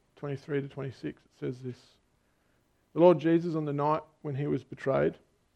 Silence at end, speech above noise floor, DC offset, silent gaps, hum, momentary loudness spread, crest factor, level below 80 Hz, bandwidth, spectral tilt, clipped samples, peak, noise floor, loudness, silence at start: 0.4 s; 41 dB; under 0.1%; none; none; 17 LU; 22 dB; -66 dBFS; 7.4 kHz; -9 dB/octave; under 0.1%; -8 dBFS; -71 dBFS; -30 LUFS; 0.2 s